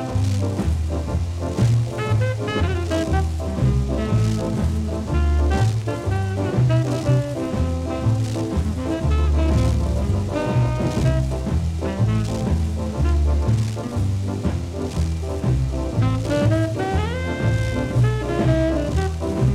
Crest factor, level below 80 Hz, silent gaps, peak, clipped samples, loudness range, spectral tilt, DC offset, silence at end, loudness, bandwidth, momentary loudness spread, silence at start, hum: 14 dB; -26 dBFS; none; -6 dBFS; under 0.1%; 1 LU; -7 dB/octave; under 0.1%; 0 s; -22 LUFS; 12.5 kHz; 5 LU; 0 s; none